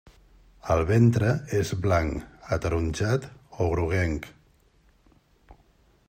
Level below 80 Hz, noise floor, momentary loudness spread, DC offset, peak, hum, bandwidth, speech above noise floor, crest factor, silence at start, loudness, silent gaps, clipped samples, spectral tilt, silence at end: -44 dBFS; -61 dBFS; 15 LU; under 0.1%; -8 dBFS; none; 15.5 kHz; 37 dB; 18 dB; 0.65 s; -26 LUFS; none; under 0.1%; -7 dB/octave; 0.55 s